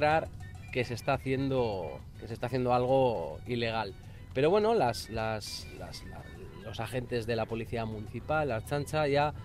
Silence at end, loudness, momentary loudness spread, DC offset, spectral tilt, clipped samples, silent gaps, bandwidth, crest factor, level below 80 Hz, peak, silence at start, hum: 0 s; -32 LUFS; 16 LU; under 0.1%; -6 dB/octave; under 0.1%; none; 16 kHz; 18 dB; -52 dBFS; -14 dBFS; 0 s; none